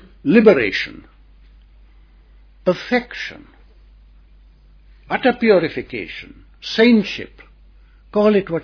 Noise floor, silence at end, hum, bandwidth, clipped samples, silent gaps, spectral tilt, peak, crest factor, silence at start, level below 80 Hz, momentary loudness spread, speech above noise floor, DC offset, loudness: -47 dBFS; 0 s; none; 5.4 kHz; under 0.1%; none; -6.5 dB/octave; 0 dBFS; 20 dB; 0.25 s; -48 dBFS; 17 LU; 31 dB; under 0.1%; -17 LUFS